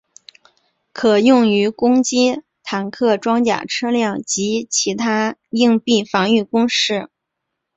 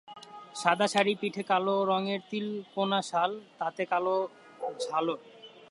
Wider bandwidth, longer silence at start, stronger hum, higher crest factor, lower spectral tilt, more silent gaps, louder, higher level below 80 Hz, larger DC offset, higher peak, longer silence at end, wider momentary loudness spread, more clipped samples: second, 8.2 kHz vs 11.5 kHz; first, 0.95 s vs 0.1 s; neither; second, 16 dB vs 22 dB; about the same, -3.5 dB/octave vs -4.5 dB/octave; neither; first, -17 LUFS vs -30 LUFS; first, -60 dBFS vs -84 dBFS; neither; first, -2 dBFS vs -8 dBFS; first, 0.7 s vs 0.05 s; second, 8 LU vs 13 LU; neither